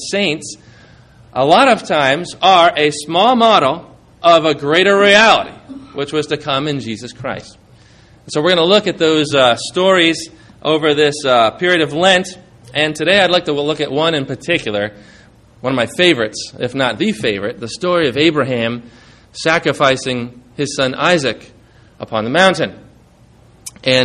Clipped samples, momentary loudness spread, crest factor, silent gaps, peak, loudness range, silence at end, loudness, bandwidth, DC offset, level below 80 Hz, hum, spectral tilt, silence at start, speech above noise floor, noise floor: under 0.1%; 15 LU; 16 dB; none; 0 dBFS; 5 LU; 0 s; -14 LUFS; 12.5 kHz; under 0.1%; -52 dBFS; none; -4 dB/octave; 0 s; 32 dB; -46 dBFS